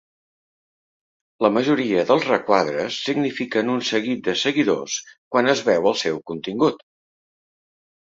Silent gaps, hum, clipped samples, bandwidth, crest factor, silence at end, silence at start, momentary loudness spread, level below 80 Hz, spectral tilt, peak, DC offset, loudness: 5.18-5.31 s; none; under 0.1%; 7.8 kHz; 20 dB; 1.25 s; 1.4 s; 7 LU; -64 dBFS; -4 dB/octave; -2 dBFS; under 0.1%; -21 LUFS